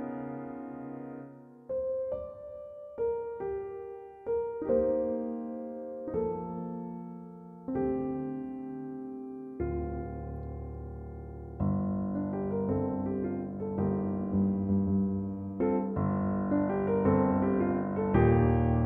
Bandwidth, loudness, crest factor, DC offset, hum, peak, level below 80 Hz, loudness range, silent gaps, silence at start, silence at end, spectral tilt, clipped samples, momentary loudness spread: 3.4 kHz; -32 LUFS; 20 dB; under 0.1%; none; -12 dBFS; -46 dBFS; 8 LU; none; 0 s; 0 s; -12.5 dB/octave; under 0.1%; 16 LU